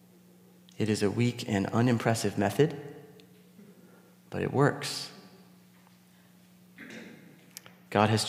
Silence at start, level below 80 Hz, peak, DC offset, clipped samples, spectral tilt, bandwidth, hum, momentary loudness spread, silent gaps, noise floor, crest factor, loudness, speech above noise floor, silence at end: 0.8 s; -72 dBFS; -6 dBFS; under 0.1%; under 0.1%; -5.5 dB/octave; 16 kHz; none; 22 LU; none; -59 dBFS; 24 dB; -29 LUFS; 31 dB; 0 s